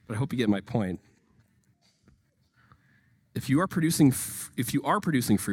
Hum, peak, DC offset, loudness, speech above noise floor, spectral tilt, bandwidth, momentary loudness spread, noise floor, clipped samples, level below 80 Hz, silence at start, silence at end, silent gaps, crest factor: none; -10 dBFS; under 0.1%; -27 LUFS; 40 dB; -5.5 dB/octave; 17.5 kHz; 12 LU; -67 dBFS; under 0.1%; -60 dBFS; 0.1 s; 0 s; none; 18 dB